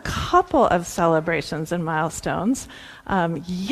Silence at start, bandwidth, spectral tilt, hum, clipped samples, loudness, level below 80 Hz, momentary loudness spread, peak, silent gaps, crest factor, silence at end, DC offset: 0 s; 15 kHz; -5.5 dB/octave; none; under 0.1%; -22 LUFS; -42 dBFS; 9 LU; -4 dBFS; none; 18 dB; 0 s; under 0.1%